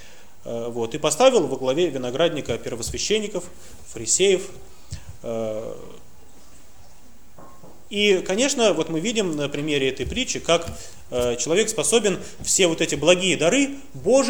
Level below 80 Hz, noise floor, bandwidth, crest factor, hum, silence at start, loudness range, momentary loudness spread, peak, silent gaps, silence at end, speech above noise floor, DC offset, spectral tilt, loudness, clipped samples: -48 dBFS; -52 dBFS; over 20 kHz; 20 dB; none; 0 s; 7 LU; 16 LU; -2 dBFS; none; 0 s; 30 dB; 1%; -3 dB/octave; -21 LUFS; under 0.1%